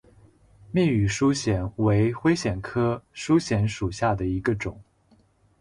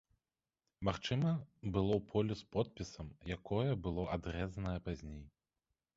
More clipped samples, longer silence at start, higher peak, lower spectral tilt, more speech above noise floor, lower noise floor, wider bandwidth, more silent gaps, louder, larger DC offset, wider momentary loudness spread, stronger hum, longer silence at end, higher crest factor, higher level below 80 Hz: neither; about the same, 0.7 s vs 0.8 s; first, -10 dBFS vs -20 dBFS; about the same, -6.5 dB/octave vs -6.5 dB/octave; second, 38 dB vs over 52 dB; second, -61 dBFS vs under -90 dBFS; first, 11 kHz vs 7.6 kHz; neither; first, -25 LUFS vs -39 LUFS; neither; second, 6 LU vs 12 LU; neither; first, 0.8 s vs 0.65 s; about the same, 16 dB vs 20 dB; first, -44 dBFS vs -54 dBFS